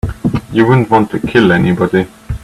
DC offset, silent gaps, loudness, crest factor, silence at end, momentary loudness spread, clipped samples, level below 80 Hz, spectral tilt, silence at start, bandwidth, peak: under 0.1%; none; -12 LUFS; 12 dB; 0.05 s; 8 LU; under 0.1%; -32 dBFS; -7.5 dB/octave; 0.05 s; 13.5 kHz; 0 dBFS